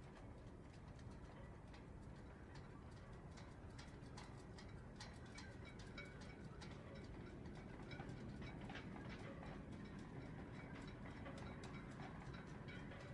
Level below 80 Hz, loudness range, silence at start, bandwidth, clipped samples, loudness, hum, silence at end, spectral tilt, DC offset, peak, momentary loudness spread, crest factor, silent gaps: -64 dBFS; 4 LU; 0 s; 11 kHz; under 0.1%; -56 LUFS; none; 0 s; -6 dB/octave; under 0.1%; -40 dBFS; 5 LU; 16 dB; none